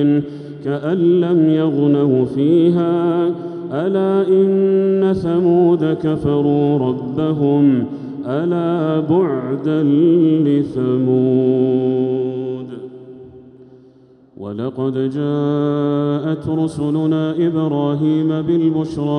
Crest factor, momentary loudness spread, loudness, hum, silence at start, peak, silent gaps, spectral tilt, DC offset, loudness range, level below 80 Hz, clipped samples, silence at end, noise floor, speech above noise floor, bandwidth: 12 dB; 10 LU; -16 LUFS; none; 0 s; -4 dBFS; none; -9.5 dB/octave; under 0.1%; 6 LU; -54 dBFS; under 0.1%; 0 s; -47 dBFS; 32 dB; 9.4 kHz